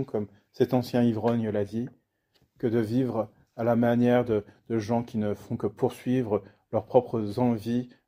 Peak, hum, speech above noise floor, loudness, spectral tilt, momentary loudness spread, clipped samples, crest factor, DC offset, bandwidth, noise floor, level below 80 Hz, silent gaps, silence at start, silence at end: -6 dBFS; none; 43 dB; -27 LUFS; -8 dB/octave; 9 LU; under 0.1%; 20 dB; under 0.1%; 15.5 kHz; -69 dBFS; -62 dBFS; none; 0 s; 0.2 s